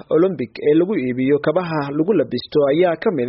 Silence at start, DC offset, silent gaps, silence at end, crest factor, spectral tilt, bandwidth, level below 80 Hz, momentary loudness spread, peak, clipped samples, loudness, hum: 0.1 s; under 0.1%; none; 0 s; 12 dB; -6 dB/octave; 5.8 kHz; -58 dBFS; 4 LU; -4 dBFS; under 0.1%; -18 LUFS; none